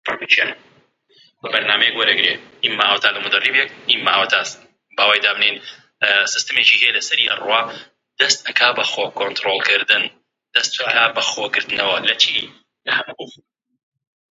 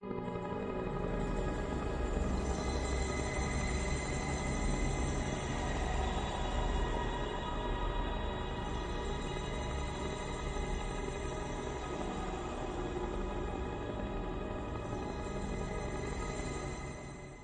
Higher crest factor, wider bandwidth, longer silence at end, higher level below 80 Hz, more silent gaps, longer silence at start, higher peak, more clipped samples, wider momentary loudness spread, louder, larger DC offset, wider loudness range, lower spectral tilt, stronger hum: about the same, 20 dB vs 16 dB; first, 11 kHz vs 9.8 kHz; first, 1 s vs 0 s; second, -70 dBFS vs -40 dBFS; neither; about the same, 0.05 s vs 0 s; first, 0 dBFS vs -20 dBFS; neither; first, 9 LU vs 4 LU; first, -16 LUFS vs -38 LUFS; neither; about the same, 2 LU vs 4 LU; second, 0 dB/octave vs -5.5 dB/octave; neither